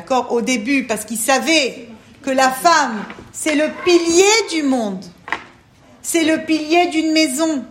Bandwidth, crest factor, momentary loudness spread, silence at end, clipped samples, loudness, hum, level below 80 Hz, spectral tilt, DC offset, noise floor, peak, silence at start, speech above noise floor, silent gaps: 16.5 kHz; 16 dB; 14 LU; 0 s; under 0.1%; -16 LUFS; none; -58 dBFS; -2.5 dB/octave; under 0.1%; -47 dBFS; 0 dBFS; 0 s; 31 dB; none